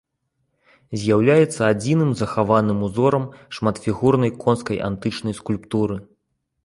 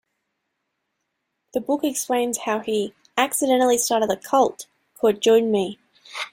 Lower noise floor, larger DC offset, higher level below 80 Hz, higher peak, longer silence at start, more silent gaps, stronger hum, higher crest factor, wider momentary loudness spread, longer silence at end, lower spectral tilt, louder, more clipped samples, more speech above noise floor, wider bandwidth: second, -73 dBFS vs -77 dBFS; neither; first, -50 dBFS vs -66 dBFS; first, -2 dBFS vs -6 dBFS; second, 0.9 s vs 1.55 s; neither; neither; about the same, 18 dB vs 18 dB; second, 9 LU vs 12 LU; first, 0.6 s vs 0.05 s; first, -7 dB/octave vs -3 dB/octave; about the same, -20 LUFS vs -21 LUFS; neither; about the same, 54 dB vs 57 dB; second, 11.5 kHz vs 16.5 kHz